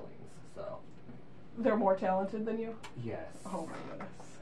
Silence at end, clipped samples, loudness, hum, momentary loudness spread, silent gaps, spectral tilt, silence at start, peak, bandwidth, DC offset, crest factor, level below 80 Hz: 0 s; under 0.1%; -36 LUFS; none; 23 LU; none; -7 dB/octave; 0 s; -16 dBFS; 11.5 kHz; 0.4%; 22 dB; -66 dBFS